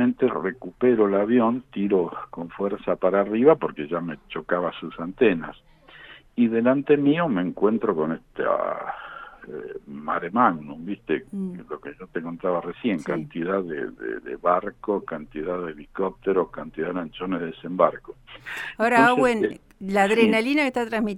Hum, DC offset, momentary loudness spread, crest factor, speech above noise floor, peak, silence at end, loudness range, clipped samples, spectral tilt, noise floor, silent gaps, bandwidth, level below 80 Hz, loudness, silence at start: none; under 0.1%; 16 LU; 20 dB; 23 dB; -4 dBFS; 0 s; 6 LU; under 0.1%; -6.5 dB/octave; -47 dBFS; none; 12.5 kHz; -56 dBFS; -24 LUFS; 0 s